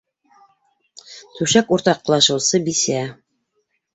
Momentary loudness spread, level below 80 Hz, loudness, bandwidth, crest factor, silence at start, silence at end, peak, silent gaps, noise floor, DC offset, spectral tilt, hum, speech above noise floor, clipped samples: 23 LU; -60 dBFS; -17 LUFS; 8.4 kHz; 20 dB; 1.1 s; 0.8 s; -2 dBFS; none; -70 dBFS; under 0.1%; -3 dB/octave; none; 52 dB; under 0.1%